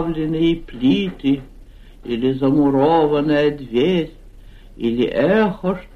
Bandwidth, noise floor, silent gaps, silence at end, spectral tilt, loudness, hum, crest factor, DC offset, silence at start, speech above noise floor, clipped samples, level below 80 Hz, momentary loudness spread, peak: 6.8 kHz; -41 dBFS; none; 0.1 s; -8 dB/octave; -18 LUFS; none; 14 dB; under 0.1%; 0 s; 23 dB; under 0.1%; -40 dBFS; 9 LU; -4 dBFS